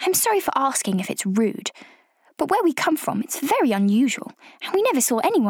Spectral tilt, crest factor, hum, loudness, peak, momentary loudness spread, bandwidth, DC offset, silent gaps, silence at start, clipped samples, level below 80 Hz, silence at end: -4 dB/octave; 12 dB; none; -21 LUFS; -8 dBFS; 10 LU; 20 kHz; under 0.1%; none; 0 s; under 0.1%; -68 dBFS; 0 s